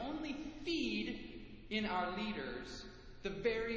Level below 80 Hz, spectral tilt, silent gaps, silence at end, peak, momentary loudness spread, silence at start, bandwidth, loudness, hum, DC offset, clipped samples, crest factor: -58 dBFS; -5 dB/octave; none; 0 s; -22 dBFS; 13 LU; 0 s; 8 kHz; -41 LUFS; none; under 0.1%; under 0.1%; 18 dB